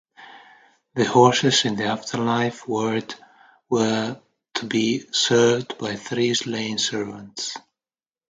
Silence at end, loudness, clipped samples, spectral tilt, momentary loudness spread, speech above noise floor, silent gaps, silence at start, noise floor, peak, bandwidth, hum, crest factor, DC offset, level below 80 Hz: 0.7 s; -22 LUFS; under 0.1%; -4 dB/octave; 14 LU; over 68 dB; none; 0.2 s; under -90 dBFS; -2 dBFS; 9.6 kHz; none; 22 dB; under 0.1%; -64 dBFS